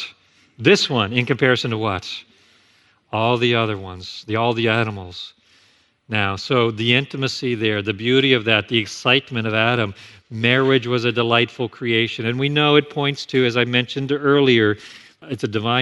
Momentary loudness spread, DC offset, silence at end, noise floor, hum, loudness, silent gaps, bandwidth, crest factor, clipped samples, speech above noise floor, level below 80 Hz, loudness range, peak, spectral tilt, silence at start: 12 LU; under 0.1%; 0 s; -58 dBFS; none; -19 LUFS; none; 12 kHz; 20 dB; under 0.1%; 39 dB; -60 dBFS; 4 LU; 0 dBFS; -5.5 dB/octave; 0 s